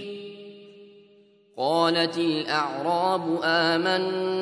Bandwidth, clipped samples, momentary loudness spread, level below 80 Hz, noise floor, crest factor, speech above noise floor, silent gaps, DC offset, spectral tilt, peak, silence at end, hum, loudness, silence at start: 11 kHz; under 0.1%; 17 LU; -78 dBFS; -57 dBFS; 18 dB; 33 dB; none; under 0.1%; -5 dB/octave; -8 dBFS; 0 s; none; -24 LUFS; 0 s